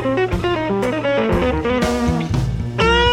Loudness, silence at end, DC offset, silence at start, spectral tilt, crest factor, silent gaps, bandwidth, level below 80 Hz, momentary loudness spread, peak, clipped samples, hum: -18 LUFS; 0 s; under 0.1%; 0 s; -6 dB/octave; 16 dB; none; 16 kHz; -28 dBFS; 4 LU; -2 dBFS; under 0.1%; none